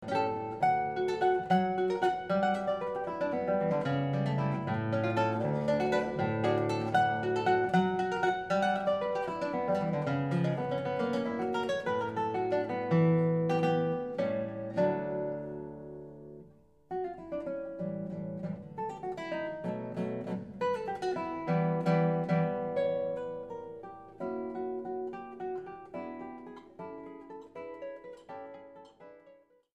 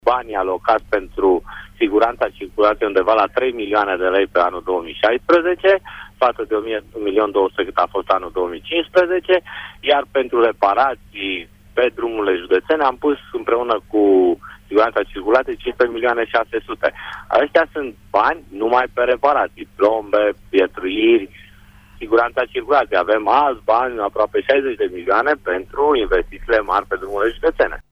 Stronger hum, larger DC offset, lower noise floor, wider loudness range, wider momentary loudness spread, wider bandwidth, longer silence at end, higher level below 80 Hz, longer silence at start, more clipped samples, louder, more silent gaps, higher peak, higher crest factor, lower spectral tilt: neither; neither; first, -61 dBFS vs -45 dBFS; first, 11 LU vs 2 LU; first, 16 LU vs 8 LU; first, 9.8 kHz vs 6.6 kHz; first, 0.4 s vs 0.1 s; second, -68 dBFS vs -44 dBFS; about the same, 0 s vs 0.05 s; neither; second, -32 LUFS vs -18 LUFS; neither; second, -14 dBFS vs -4 dBFS; about the same, 18 dB vs 14 dB; first, -7.5 dB/octave vs -5.5 dB/octave